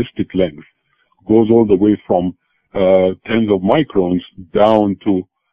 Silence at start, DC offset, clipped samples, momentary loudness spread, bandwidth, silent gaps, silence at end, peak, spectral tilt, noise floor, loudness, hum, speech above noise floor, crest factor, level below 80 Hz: 0 s; under 0.1%; under 0.1%; 9 LU; 5 kHz; none; 0.3 s; 0 dBFS; -9.5 dB/octave; -59 dBFS; -15 LUFS; none; 45 dB; 16 dB; -44 dBFS